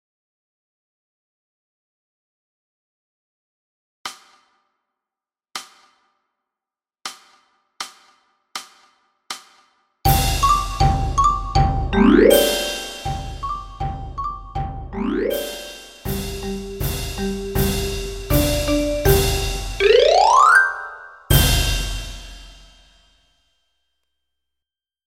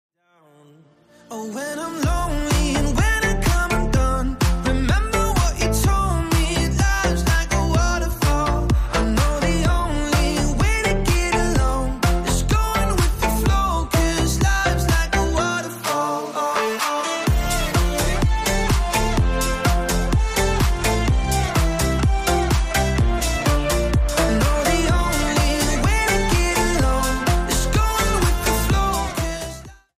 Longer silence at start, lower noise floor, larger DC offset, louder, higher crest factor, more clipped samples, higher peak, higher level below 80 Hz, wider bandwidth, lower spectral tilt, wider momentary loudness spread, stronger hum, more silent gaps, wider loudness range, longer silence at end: first, 4.05 s vs 1.3 s; first, -90 dBFS vs -55 dBFS; neither; about the same, -19 LUFS vs -20 LUFS; first, 20 dB vs 12 dB; neither; first, 0 dBFS vs -8 dBFS; second, -30 dBFS vs -22 dBFS; about the same, 16.5 kHz vs 15.5 kHz; about the same, -4.5 dB/octave vs -4.5 dB/octave; first, 21 LU vs 3 LU; neither; neither; first, 24 LU vs 2 LU; first, 2.55 s vs 0.25 s